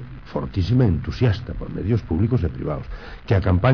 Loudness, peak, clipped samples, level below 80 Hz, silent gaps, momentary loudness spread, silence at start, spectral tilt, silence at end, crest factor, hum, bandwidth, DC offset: -22 LUFS; -8 dBFS; under 0.1%; -34 dBFS; none; 12 LU; 0 s; -9 dB/octave; 0 s; 14 dB; none; 5.4 kHz; 0.5%